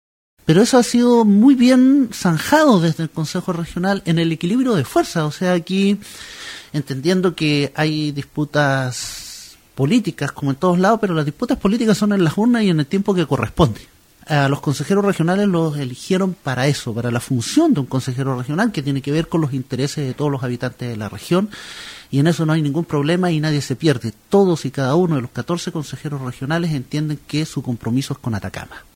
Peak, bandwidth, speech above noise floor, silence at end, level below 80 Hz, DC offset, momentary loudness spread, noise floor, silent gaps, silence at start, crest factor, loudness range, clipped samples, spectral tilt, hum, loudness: 0 dBFS; 16.5 kHz; 21 dB; 0.15 s; -46 dBFS; under 0.1%; 13 LU; -39 dBFS; none; 0.45 s; 16 dB; 6 LU; under 0.1%; -6 dB/octave; none; -18 LUFS